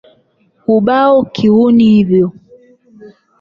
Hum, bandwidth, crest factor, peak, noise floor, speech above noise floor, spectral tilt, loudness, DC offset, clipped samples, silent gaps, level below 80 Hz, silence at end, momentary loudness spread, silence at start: none; 6.2 kHz; 12 dB; -2 dBFS; -55 dBFS; 46 dB; -8.5 dB/octave; -10 LUFS; under 0.1%; under 0.1%; none; -50 dBFS; 0.3 s; 7 LU; 0.7 s